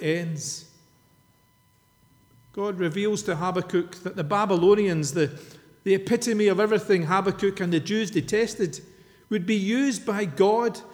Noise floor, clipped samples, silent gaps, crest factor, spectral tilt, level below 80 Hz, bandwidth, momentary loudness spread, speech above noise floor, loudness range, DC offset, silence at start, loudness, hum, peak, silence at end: -62 dBFS; under 0.1%; none; 16 dB; -5.5 dB/octave; -62 dBFS; 17.5 kHz; 11 LU; 38 dB; 7 LU; under 0.1%; 0 s; -24 LUFS; none; -8 dBFS; 0 s